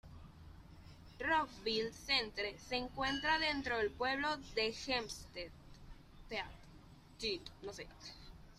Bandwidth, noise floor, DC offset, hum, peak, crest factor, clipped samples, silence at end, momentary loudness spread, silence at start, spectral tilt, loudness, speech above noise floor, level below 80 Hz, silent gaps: 14.5 kHz; -59 dBFS; under 0.1%; none; -20 dBFS; 22 dB; under 0.1%; 0 s; 24 LU; 0.05 s; -3 dB/octave; -38 LUFS; 19 dB; -60 dBFS; none